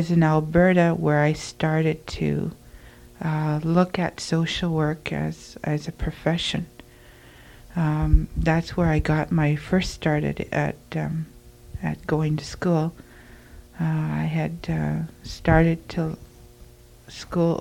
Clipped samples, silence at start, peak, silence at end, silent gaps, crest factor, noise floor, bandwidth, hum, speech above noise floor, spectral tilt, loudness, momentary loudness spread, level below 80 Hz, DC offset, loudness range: under 0.1%; 0 s; -4 dBFS; 0 s; none; 20 dB; -48 dBFS; 12 kHz; none; 26 dB; -7 dB/octave; -24 LUFS; 12 LU; -34 dBFS; under 0.1%; 4 LU